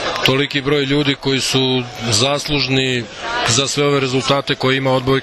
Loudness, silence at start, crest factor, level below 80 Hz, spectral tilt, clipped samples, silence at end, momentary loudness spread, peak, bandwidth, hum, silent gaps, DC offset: -16 LUFS; 0 s; 16 dB; -42 dBFS; -4 dB/octave; under 0.1%; 0 s; 3 LU; 0 dBFS; 13.5 kHz; none; none; under 0.1%